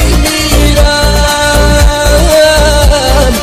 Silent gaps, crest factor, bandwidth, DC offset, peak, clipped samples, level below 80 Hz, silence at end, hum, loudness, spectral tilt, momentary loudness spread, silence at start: none; 6 dB; 15.5 kHz; under 0.1%; 0 dBFS; 0.5%; -10 dBFS; 0 s; none; -7 LUFS; -4 dB/octave; 3 LU; 0 s